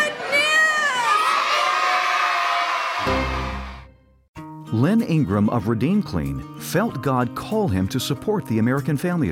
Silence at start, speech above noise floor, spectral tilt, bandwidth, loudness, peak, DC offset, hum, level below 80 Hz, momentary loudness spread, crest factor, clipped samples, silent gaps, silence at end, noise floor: 0 s; 26 dB; -5 dB/octave; 16.5 kHz; -20 LUFS; -8 dBFS; under 0.1%; none; -40 dBFS; 10 LU; 14 dB; under 0.1%; 4.28-4.34 s; 0 s; -47 dBFS